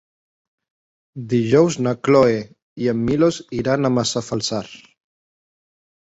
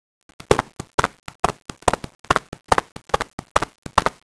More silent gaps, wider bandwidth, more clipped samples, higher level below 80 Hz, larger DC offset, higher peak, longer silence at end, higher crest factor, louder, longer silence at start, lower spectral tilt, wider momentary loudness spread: second, 2.62-2.76 s vs 0.94-0.98 s, 1.35-1.43 s, 2.15-2.24 s, 2.92-2.96 s, 3.33-3.38 s, 3.51-3.55 s, 3.78-3.82 s; second, 8.2 kHz vs 11 kHz; neither; second, -52 dBFS vs -40 dBFS; neither; about the same, -2 dBFS vs 0 dBFS; first, 1.35 s vs 0.15 s; second, 18 dB vs 24 dB; first, -19 LUFS vs -23 LUFS; first, 1.15 s vs 0.5 s; first, -5.5 dB/octave vs -3.5 dB/octave; first, 15 LU vs 4 LU